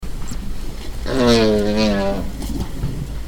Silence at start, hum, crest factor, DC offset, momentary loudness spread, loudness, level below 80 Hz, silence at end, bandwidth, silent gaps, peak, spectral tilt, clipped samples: 0 s; none; 18 dB; under 0.1%; 16 LU; -19 LUFS; -26 dBFS; 0 s; 18 kHz; none; 0 dBFS; -5.5 dB/octave; under 0.1%